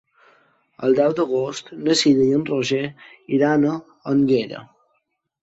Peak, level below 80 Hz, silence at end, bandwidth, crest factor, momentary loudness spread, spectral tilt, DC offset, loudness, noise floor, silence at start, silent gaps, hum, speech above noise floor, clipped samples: -4 dBFS; -62 dBFS; 0.75 s; 8 kHz; 16 dB; 12 LU; -5 dB/octave; under 0.1%; -20 LUFS; -72 dBFS; 0.8 s; none; none; 52 dB; under 0.1%